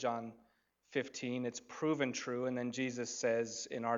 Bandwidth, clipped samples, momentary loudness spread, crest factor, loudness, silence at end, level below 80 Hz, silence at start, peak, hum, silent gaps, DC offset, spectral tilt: 7.8 kHz; under 0.1%; 6 LU; 18 dB; -38 LUFS; 0 s; -80 dBFS; 0 s; -20 dBFS; none; none; under 0.1%; -4 dB/octave